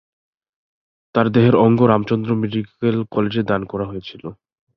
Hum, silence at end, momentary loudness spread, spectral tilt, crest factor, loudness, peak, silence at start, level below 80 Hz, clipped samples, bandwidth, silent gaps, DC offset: none; 0.45 s; 16 LU; -9.5 dB/octave; 18 dB; -18 LUFS; -2 dBFS; 1.15 s; -52 dBFS; under 0.1%; 6 kHz; none; under 0.1%